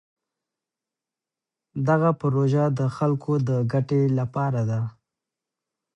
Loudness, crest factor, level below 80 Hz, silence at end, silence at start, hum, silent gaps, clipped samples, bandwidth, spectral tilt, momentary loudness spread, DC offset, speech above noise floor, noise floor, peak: -23 LUFS; 18 dB; -62 dBFS; 1.05 s; 1.75 s; none; none; under 0.1%; 8.2 kHz; -9.5 dB/octave; 7 LU; under 0.1%; 67 dB; -89 dBFS; -8 dBFS